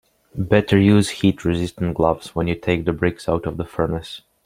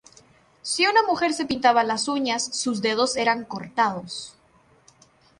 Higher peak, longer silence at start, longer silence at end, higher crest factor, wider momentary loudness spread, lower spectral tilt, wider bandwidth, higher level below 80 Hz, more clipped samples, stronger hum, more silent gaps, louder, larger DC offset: first, -2 dBFS vs -6 dBFS; second, 0.35 s vs 0.65 s; second, 0.3 s vs 1.1 s; about the same, 18 dB vs 20 dB; about the same, 12 LU vs 14 LU; first, -6.5 dB/octave vs -2.5 dB/octave; first, 15.5 kHz vs 11.5 kHz; first, -42 dBFS vs -64 dBFS; neither; neither; neither; about the same, -20 LUFS vs -22 LUFS; neither